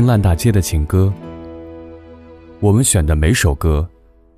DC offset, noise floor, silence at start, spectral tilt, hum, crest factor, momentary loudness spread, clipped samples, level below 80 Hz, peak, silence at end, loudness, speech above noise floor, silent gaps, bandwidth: under 0.1%; -39 dBFS; 0 s; -5.5 dB/octave; none; 14 dB; 20 LU; under 0.1%; -24 dBFS; -2 dBFS; 0.5 s; -15 LUFS; 25 dB; none; 15.5 kHz